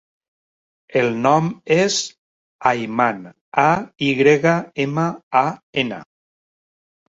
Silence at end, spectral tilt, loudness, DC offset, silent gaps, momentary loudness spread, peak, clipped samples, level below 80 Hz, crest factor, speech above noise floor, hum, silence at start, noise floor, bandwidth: 1.1 s; -5 dB/octave; -19 LUFS; under 0.1%; 2.18-2.59 s, 3.41-3.52 s, 5.23-5.31 s, 5.63-5.73 s; 8 LU; -2 dBFS; under 0.1%; -60 dBFS; 18 dB; over 72 dB; none; 0.9 s; under -90 dBFS; 8 kHz